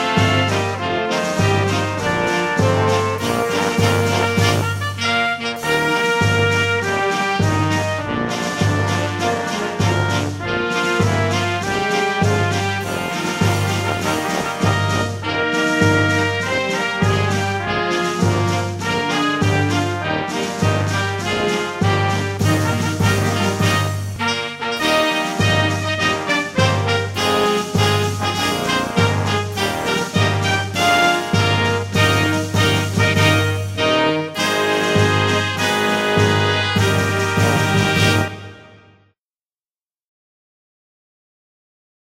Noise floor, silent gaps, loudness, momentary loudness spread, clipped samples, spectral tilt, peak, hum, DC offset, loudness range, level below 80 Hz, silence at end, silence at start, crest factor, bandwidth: under -90 dBFS; none; -18 LUFS; 5 LU; under 0.1%; -4.5 dB/octave; -2 dBFS; none; under 0.1%; 3 LU; -46 dBFS; 3.4 s; 0 s; 16 dB; 16 kHz